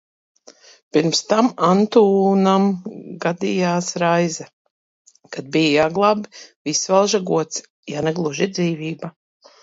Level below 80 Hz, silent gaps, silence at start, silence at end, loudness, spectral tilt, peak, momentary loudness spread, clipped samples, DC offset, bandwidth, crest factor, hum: -62 dBFS; 4.53-4.65 s, 4.71-5.05 s, 6.56-6.65 s, 7.70-7.83 s; 0.95 s; 0.5 s; -19 LUFS; -5 dB/octave; -2 dBFS; 16 LU; under 0.1%; under 0.1%; 7.8 kHz; 18 dB; none